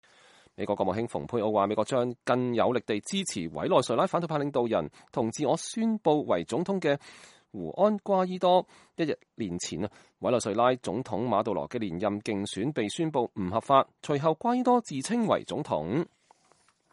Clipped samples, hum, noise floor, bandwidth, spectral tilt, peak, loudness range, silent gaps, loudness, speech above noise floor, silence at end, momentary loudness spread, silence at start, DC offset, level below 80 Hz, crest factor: under 0.1%; none; -66 dBFS; 11.5 kHz; -5.5 dB/octave; -8 dBFS; 2 LU; none; -28 LUFS; 38 dB; 0.85 s; 8 LU; 0.6 s; under 0.1%; -66 dBFS; 20 dB